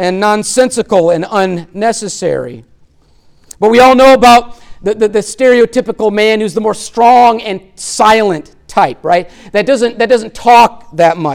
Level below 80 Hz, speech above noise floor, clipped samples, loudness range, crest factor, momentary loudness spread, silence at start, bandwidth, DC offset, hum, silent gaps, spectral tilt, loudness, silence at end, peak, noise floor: -42 dBFS; 37 dB; under 0.1%; 4 LU; 10 dB; 11 LU; 0 s; 17 kHz; under 0.1%; none; none; -4 dB/octave; -10 LUFS; 0 s; 0 dBFS; -46 dBFS